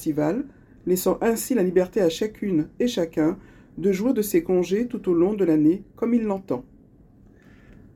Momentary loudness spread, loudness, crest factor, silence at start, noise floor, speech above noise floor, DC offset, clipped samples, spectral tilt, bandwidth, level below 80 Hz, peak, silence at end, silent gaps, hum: 9 LU; -23 LUFS; 16 dB; 0 s; -52 dBFS; 30 dB; under 0.1%; under 0.1%; -6 dB/octave; 17 kHz; -54 dBFS; -8 dBFS; 1.35 s; none; none